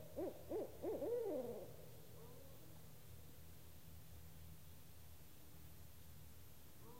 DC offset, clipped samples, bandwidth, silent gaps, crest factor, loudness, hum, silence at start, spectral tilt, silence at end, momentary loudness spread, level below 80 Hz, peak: 0.1%; under 0.1%; 16 kHz; none; 18 dB; -53 LUFS; none; 0 s; -6 dB/octave; 0 s; 17 LU; -68 dBFS; -34 dBFS